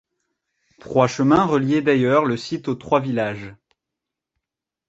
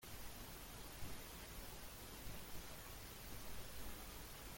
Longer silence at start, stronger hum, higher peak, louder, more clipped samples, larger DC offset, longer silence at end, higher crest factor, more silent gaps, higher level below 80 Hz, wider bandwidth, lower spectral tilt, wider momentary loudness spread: first, 0.85 s vs 0 s; neither; first, -2 dBFS vs -36 dBFS; first, -19 LUFS vs -53 LUFS; neither; neither; first, 1.35 s vs 0 s; first, 20 dB vs 14 dB; neither; about the same, -56 dBFS vs -58 dBFS; second, 8 kHz vs 17 kHz; first, -6.5 dB/octave vs -3 dB/octave; first, 10 LU vs 1 LU